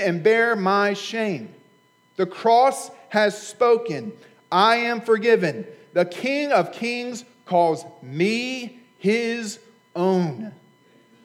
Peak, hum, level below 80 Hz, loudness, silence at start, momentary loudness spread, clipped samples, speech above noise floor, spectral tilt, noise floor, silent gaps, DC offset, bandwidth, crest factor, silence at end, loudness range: -4 dBFS; none; -86 dBFS; -21 LUFS; 0 s; 17 LU; under 0.1%; 38 dB; -5 dB/octave; -59 dBFS; none; under 0.1%; 14.5 kHz; 18 dB; 0.7 s; 4 LU